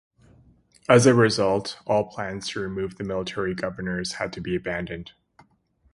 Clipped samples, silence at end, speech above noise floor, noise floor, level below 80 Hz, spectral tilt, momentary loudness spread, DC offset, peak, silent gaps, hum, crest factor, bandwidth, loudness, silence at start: under 0.1%; 0.85 s; 41 dB; -64 dBFS; -52 dBFS; -5 dB/octave; 13 LU; under 0.1%; 0 dBFS; none; none; 24 dB; 11.5 kHz; -24 LUFS; 0.9 s